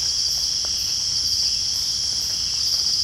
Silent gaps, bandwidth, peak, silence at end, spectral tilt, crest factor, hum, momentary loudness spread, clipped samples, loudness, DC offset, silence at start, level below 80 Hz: none; 16.5 kHz; -8 dBFS; 0 s; 1 dB/octave; 14 dB; none; 2 LU; under 0.1%; -19 LUFS; under 0.1%; 0 s; -46 dBFS